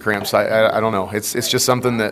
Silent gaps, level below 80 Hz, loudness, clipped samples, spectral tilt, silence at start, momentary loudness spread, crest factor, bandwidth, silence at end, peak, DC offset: none; -54 dBFS; -17 LUFS; under 0.1%; -3.5 dB/octave; 0 s; 5 LU; 16 dB; 15.5 kHz; 0 s; 0 dBFS; under 0.1%